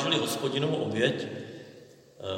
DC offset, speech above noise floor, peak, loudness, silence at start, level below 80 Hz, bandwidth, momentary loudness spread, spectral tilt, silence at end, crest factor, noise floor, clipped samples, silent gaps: under 0.1%; 23 dB; -12 dBFS; -29 LUFS; 0 s; -72 dBFS; 16.5 kHz; 18 LU; -4.5 dB/octave; 0 s; 20 dB; -52 dBFS; under 0.1%; none